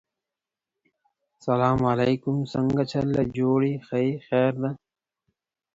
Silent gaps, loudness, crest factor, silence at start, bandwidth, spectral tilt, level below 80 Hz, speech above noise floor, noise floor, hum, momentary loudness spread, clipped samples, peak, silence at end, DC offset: none; -24 LUFS; 18 dB; 1.45 s; 7.8 kHz; -8.5 dB/octave; -54 dBFS; 65 dB; -89 dBFS; none; 6 LU; under 0.1%; -8 dBFS; 1 s; under 0.1%